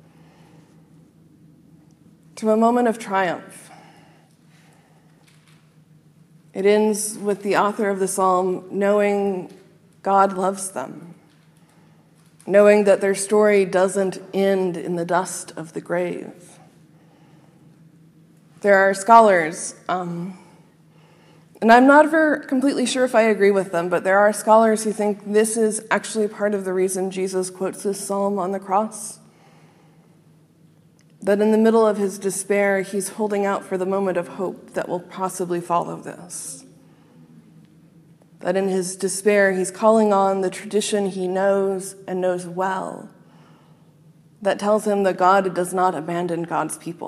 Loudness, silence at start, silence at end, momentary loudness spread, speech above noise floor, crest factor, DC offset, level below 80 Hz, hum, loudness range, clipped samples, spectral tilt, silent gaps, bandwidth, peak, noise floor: -20 LUFS; 2.35 s; 0 s; 14 LU; 34 dB; 22 dB; under 0.1%; -72 dBFS; none; 9 LU; under 0.1%; -4.5 dB/octave; none; 14.5 kHz; 0 dBFS; -54 dBFS